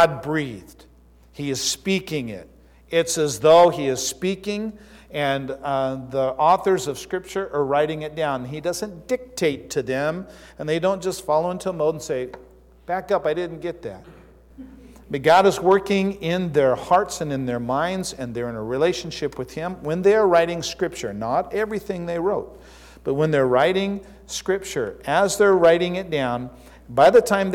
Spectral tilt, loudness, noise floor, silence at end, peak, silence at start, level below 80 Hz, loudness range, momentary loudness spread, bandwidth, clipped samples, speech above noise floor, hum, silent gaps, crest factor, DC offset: -4.5 dB/octave; -22 LUFS; -51 dBFS; 0 s; -6 dBFS; 0 s; -50 dBFS; 5 LU; 14 LU; 17 kHz; under 0.1%; 30 dB; none; none; 16 dB; under 0.1%